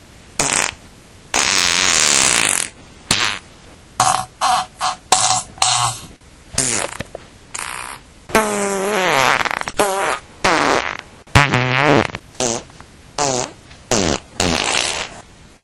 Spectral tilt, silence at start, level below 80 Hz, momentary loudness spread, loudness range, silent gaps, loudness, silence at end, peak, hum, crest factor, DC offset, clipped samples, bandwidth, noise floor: -2 dB/octave; 0.4 s; -42 dBFS; 14 LU; 5 LU; none; -17 LUFS; 0.45 s; 0 dBFS; none; 20 dB; under 0.1%; under 0.1%; over 20 kHz; -43 dBFS